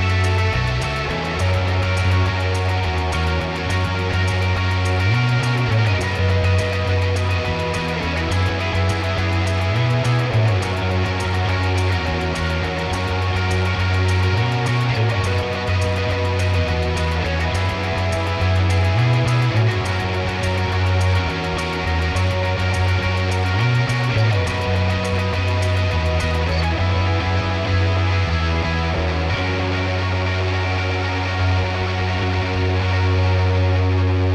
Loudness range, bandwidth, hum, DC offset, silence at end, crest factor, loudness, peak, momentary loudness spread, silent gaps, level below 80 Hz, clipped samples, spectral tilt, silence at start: 1 LU; 11.5 kHz; none; under 0.1%; 0 s; 12 dB; -19 LUFS; -6 dBFS; 3 LU; none; -32 dBFS; under 0.1%; -6 dB/octave; 0 s